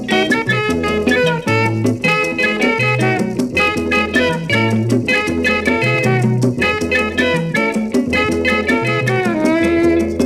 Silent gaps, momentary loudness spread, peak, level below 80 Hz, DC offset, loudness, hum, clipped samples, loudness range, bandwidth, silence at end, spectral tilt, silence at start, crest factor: none; 2 LU; -2 dBFS; -40 dBFS; under 0.1%; -15 LUFS; none; under 0.1%; 0 LU; 15 kHz; 0 s; -5.5 dB/octave; 0 s; 14 dB